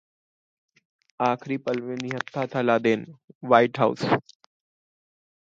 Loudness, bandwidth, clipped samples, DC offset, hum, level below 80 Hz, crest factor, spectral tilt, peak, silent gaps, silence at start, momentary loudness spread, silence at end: -24 LUFS; 7.8 kHz; under 0.1%; under 0.1%; none; -70 dBFS; 24 dB; -6.5 dB/octave; -2 dBFS; 3.24-3.28 s, 3.35-3.41 s; 1.2 s; 10 LU; 1.2 s